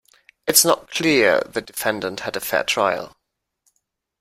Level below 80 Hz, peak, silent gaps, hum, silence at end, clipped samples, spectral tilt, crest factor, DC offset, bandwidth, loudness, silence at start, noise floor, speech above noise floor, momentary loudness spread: -58 dBFS; 0 dBFS; none; none; 1.1 s; under 0.1%; -2 dB/octave; 22 dB; under 0.1%; 16 kHz; -19 LUFS; 0.45 s; -74 dBFS; 54 dB; 13 LU